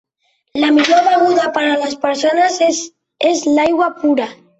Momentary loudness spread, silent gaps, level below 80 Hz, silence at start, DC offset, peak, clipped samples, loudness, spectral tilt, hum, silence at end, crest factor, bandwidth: 7 LU; none; -60 dBFS; 0.55 s; under 0.1%; -2 dBFS; under 0.1%; -14 LUFS; -2.5 dB/octave; none; 0.25 s; 14 dB; 8.2 kHz